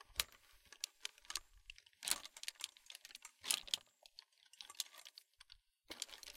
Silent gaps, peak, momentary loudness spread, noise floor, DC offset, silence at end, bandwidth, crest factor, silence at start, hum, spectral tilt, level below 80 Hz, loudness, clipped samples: none; -14 dBFS; 23 LU; -67 dBFS; under 0.1%; 0 s; 16.5 kHz; 36 dB; 0 s; none; 2 dB/octave; -74 dBFS; -45 LUFS; under 0.1%